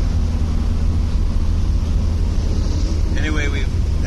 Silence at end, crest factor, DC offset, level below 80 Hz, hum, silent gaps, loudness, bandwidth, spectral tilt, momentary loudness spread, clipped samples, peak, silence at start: 0 s; 12 dB; under 0.1%; -18 dBFS; none; none; -21 LUFS; 9.8 kHz; -6.5 dB/octave; 1 LU; under 0.1%; -6 dBFS; 0 s